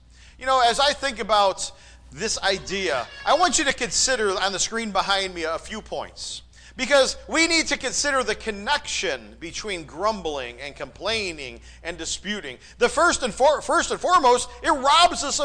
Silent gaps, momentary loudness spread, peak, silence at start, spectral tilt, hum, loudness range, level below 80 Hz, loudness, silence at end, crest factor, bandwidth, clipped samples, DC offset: none; 14 LU; -8 dBFS; 0.4 s; -1.5 dB/octave; none; 6 LU; -46 dBFS; -22 LUFS; 0 s; 16 dB; 10.5 kHz; under 0.1%; under 0.1%